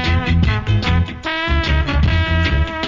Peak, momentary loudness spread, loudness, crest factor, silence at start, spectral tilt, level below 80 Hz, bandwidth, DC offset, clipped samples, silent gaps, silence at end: -4 dBFS; 3 LU; -17 LUFS; 12 dB; 0 s; -6.5 dB/octave; -20 dBFS; 7.4 kHz; under 0.1%; under 0.1%; none; 0 s